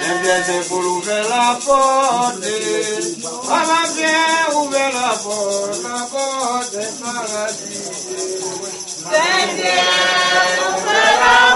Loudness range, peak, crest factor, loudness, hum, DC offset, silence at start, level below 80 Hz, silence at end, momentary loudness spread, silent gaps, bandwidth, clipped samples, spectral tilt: 6 LU; 0 dBFS; 16 dB; -16 LUFS; none; under 0.1%; 0 s; -54 dBFS; 0 s; 10 LU; none; 11.5 kHz; under 0.1%; -1 dB/octave